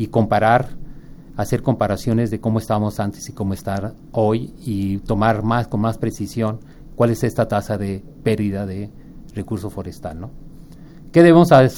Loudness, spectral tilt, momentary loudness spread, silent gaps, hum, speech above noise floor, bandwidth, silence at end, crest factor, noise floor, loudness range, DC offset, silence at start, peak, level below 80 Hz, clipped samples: -19 LUFS; -7.5 dB/octave; 16 LU; none; none; 21 dB; 18 kHz; 0 s; 18 dB; -39 dBFS; 4 LU; under 0.1%; 0 s; 0 dBFS; -40 dBFS; under 0.1%